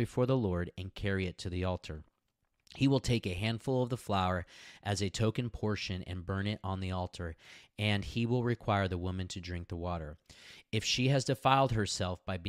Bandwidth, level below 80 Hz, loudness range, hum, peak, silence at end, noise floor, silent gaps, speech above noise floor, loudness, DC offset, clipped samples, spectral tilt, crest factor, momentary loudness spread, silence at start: 14 kHz; -54 dBFS; 3 LU; none; -12 dBFS; 0 s; -80 dBFS; none; 47 dB; -34 LUFS; under 0.1%; under 0.1%; -5.5 dB/octave; 22 dB; 14 LU; 0 s